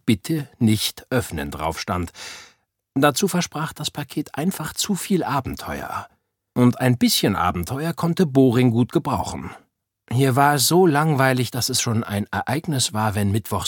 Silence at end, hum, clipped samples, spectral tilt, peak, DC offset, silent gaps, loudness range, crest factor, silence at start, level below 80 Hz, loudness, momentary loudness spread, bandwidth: 0 s; none; under 0.1%; -5 dB/octave; -2 dBFS; under 0.1%; none; 5 LU; 20 dB; 0.05 s; -48 dBFS; -21 LUFS; 13 LU; 17.5 kHz